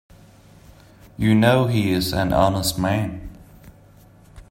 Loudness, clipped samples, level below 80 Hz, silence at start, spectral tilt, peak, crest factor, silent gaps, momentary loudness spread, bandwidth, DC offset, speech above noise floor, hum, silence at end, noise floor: -20 LUFS; under 0.1%; -42 dBFS; 1.2 s; -5.5 dB/octave; -2 dBFS; 20 dB; none; 12 LU; 16.5 kHz; under 0.1%; 30 dB; none; 0.1 s; -49 dBFS